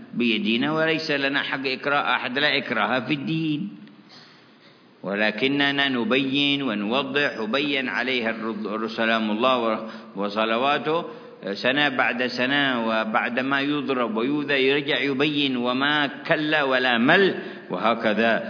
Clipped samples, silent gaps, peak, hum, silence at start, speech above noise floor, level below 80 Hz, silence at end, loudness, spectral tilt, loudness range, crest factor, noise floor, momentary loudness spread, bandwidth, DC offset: under 0.1%; none; -2 dBFS; none; 0 s; 29 dB; -74 dBFS; 0 s; -22 LUFS; -6 dB/octave; 4 LU; 20 dB; -52 dBFS; 7 LU; 5.4 kHz; under 0.1%